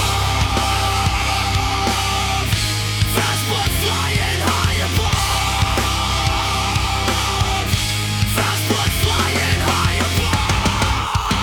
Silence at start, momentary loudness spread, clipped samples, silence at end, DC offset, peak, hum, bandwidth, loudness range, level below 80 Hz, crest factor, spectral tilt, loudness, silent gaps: 0 s; 2 LU; under 0.1%; 0 s; under 0.1%; -4 dBFS; none; 18 kHz; 1 LU; -26 dBFS; 14 dB; -3.5 dB/octave; -18 LUFS; none